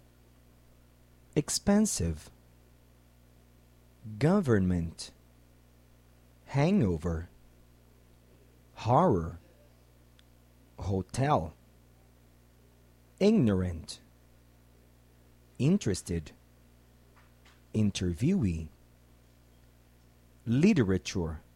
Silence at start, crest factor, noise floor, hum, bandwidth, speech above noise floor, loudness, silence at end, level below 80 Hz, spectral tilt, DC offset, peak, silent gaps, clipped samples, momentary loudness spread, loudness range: 1.35 s; 20 dB; -60 dBFS; 60 Hz at -60 dBFS; 15.5 kHz; 32 dB; -29 LUFS; 0.15 s; -52 dBFS; -6 dB/octave; under 0.1%; -12 dBFS; none; under 0.1%; 19 LU; 5 LU